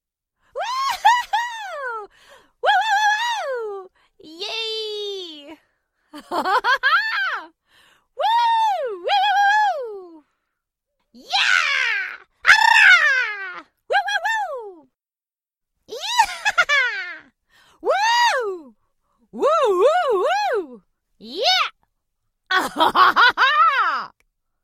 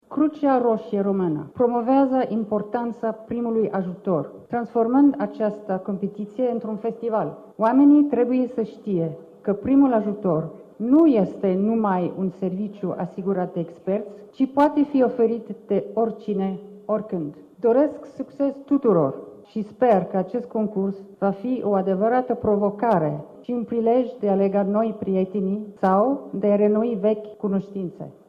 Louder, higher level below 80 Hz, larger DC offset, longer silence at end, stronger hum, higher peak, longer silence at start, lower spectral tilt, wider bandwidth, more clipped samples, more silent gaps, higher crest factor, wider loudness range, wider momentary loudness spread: first, -18 LUFS vs -22 LUFS; about the same, -64 dBFS vs -64 dBFS; neither; first, 0.55 s vs 0.2 s; neither; first, 0 dBFS vs -6 dBFS; first, 0.55 s vs 0.1 s; second, 0 dB/octave vs -10 dB/octave; first, 16 kHz vs 5 kHz; neither; neither; about the same, 20 dB vs 16 dB; first, 7 LU vs 3 LU; first, 18 LU vs 11 LU